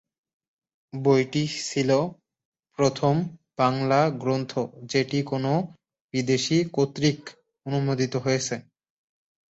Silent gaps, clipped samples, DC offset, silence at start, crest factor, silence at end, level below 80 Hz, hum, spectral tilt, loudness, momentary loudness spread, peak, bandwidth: 2.45-2.52 s, 6.01-6.09 s; under 0.1%; under 0.1%; 0.95 s; 18 dB; 0.95 s; -62 dBFS; none; -5.5 dB/octave; -25 LUFS; 12 LU; -6 dBFS; 8.2 kHz